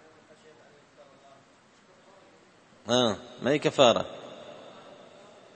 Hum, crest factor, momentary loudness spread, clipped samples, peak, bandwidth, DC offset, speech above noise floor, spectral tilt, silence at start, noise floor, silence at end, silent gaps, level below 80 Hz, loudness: none; 26 dB; 27 LU; under 0.1%; -4 dBFS; 8.8 kHz; under 0.1%; 34 dB; -4 dB/octave; 2.85 s; -59 dBFS; 1 s; none; -70 dBFS; -25 LUFS